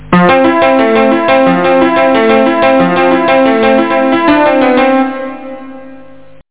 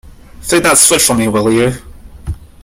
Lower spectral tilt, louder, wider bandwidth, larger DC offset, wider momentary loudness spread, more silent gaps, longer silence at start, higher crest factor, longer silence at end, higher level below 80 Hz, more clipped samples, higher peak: first, -10 dB/octave vs -3 dB/octave; about the same, -8 LUFS vs -10 LUFS; second, 4 kHz vs over 20 kHz; first, 2% vs under 0.1%; second, 7 LU vs 20 LU; neither; about the same, 0 s vs 0.05 s; second, 8 dB vs 14 dB; first, 0.55 s vs 0.2 s; second, -44 dBFS vs -34 dBFS; second, under 0.1% vs 0.1%; about the same, 0 dBFS vs 0 dBFS